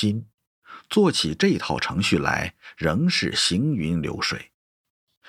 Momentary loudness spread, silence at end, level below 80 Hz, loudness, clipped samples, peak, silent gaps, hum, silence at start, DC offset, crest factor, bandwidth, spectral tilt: 7 LU; 0.85 s; -48 dBFS; -23 LUFS; under 0.1%; -4 dBFS; 0.34-0.38 s, 0.47-0.62 s; none; 0 s; under 0.1%; 20 dB; 15 kHz; -4.5 dB/octave